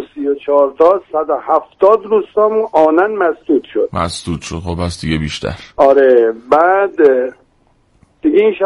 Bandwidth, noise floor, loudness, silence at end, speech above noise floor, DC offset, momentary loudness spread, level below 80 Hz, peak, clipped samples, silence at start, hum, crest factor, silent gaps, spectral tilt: 11.5 kHz; -55 dBFS; -13 LUFS; 0 s; 42 dB; under 0.1%; 10 LU; -40 dBFS; 0 dBFS; under 0.1%; 0 s; none; 14 dB; none; -6 dB/octave